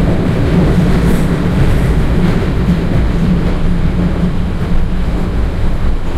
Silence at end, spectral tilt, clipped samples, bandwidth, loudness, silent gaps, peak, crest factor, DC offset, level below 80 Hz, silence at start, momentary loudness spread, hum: 0 s; -8 dB/octave; under 0.1%; 13 kHz; -14 LUFS; none; -2 dBFS; 10 dB; under 0.1%; -14 dBFS; 0 s; 6 LU; none